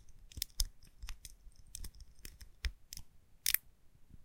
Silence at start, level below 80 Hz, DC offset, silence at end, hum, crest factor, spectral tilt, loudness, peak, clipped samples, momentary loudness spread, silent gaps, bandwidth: 0 s; -48 dBFS; under 0.1%; 0 s; none; 36 dB; 0 dB/octave; -40 LUFS; -8 dBFS; under 0.1%; 21 LU; none; 17 kHz